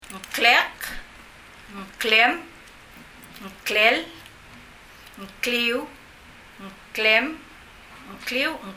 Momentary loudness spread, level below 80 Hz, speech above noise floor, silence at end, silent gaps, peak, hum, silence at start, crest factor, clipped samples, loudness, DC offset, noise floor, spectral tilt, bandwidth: 25 LU; -54 dBFS; 24 dB; 0 s; none; -2 dBFS; none; 0.05 s; 24 dB; under 0.1%; -21 LUFS; under 0.1%; -47 dBFS; -2 dB/octave; 16 kHz